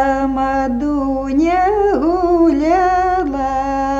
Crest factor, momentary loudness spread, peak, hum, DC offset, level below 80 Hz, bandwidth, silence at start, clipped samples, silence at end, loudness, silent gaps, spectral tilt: 12 dB; 5 LU; -4 dBFS; 50 Hz at -35 dBFS; under 0.1%; -34 dBFS; 7.8 kHz; 0 s; under 0.1%; 0 s; -15 LUFS; none; -6.5 dB/octave